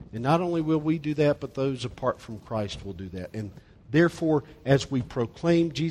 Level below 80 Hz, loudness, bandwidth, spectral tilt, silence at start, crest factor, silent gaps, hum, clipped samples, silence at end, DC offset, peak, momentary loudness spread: -52 dBFS; -27 LUFS; 11.5 kHz; -7 dB/octave; 0 s; 18 dB; none; none; under 0.1%; 0 s; under 0.1%; -8 dBFS; 13 LU